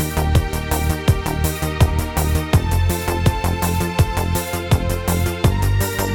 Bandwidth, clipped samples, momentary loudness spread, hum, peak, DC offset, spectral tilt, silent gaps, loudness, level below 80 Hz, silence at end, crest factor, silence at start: 20 kHz; under 0.1%; 3 LU; none; -2 dBFS; under 0.1%; -5.5 dB/octave; none; -19 LUFS; -24 dBFS; 0 s; 16 dB; 0 s